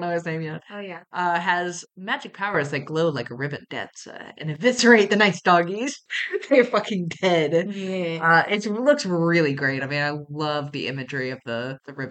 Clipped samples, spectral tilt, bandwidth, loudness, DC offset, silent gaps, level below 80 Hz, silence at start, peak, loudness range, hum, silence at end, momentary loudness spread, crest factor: under 0.1%; -5 dB/octave; 9 kHz; -22 LUFS; under 0.1%; none; -72 dBFS; 0 s; -2 dBFS; 6 LU; none; 0 s; 15 LU; 20 dB